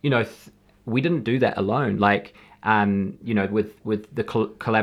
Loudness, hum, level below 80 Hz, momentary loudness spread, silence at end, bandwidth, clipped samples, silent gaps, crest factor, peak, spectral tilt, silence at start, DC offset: -23 LUFS; none; -60 dBFS; 7 LU; 0 s; 12.5 kHz; under 0.1%; none; 20 dB; -4 dBFS; -8 dB/octave; 0.05 s; under 0.1%